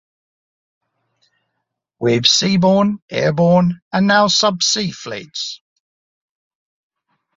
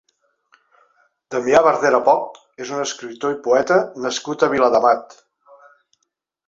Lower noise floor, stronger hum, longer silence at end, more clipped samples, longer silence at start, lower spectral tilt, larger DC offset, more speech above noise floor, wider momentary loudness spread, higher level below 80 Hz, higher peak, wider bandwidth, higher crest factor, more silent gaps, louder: about the same, -76 dBFS vs -74 dBFS; neither; first, 1.8 s vs 1.45 s; neither; first, 2 s vs 1.3 s; about the same, -4 dB/octave vs -3.5 dB/octave; neither; about the same, 60 dB vs 57 dB; about the same, 13 LU vs 12 LU; about the same, -58 dBFS vs -60 dBFS; about the same, 0 dBFS vs -2 dBFS; about the same, 7.8 kHz vs 7.8 kHz; about the same, 18 dB vs 18 dB; first, 3.02-3.08 s, 3.82-3.91 s vs none; first, -15 LUFS vs -18 LUFS